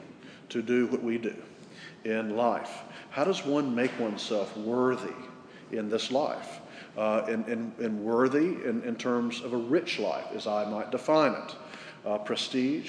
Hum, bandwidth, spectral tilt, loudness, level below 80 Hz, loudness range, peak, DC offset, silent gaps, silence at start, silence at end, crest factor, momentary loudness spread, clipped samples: none; 10.5 kHz; -5 dB/octave; -30 LUFS; -80 dBFS; 2 LU; -10 dBFS; under 0.1%; none; 0 s; 0 s; 20 dB; 16 LU; under 0.1%